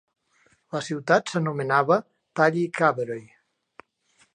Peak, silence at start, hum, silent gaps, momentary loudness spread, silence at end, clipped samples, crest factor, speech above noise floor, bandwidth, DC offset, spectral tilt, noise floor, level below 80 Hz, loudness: -4 dBFS; 0.75 s; none; none; 12 LU; 1.1 s; under 0.1%; 22 dB; 41 dB; 10.5 kHz; under 0.1%; -6 dB/octave; -64 dBFS; -78 dBFS; -24 LUFS